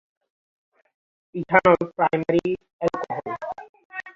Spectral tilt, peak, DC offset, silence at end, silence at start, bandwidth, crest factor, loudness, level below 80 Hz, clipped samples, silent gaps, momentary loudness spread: -7.5 dB/octave; -2 dBFS; under 0.1%; 0.05 s; 1.35 s; 7.4 kHz; 22 dB; -22 LUFS; -58 dBFS; under 0.1%; 2.73-2.79 s, 3.69-3.74 s, 3.85-3.90 s; 19 LU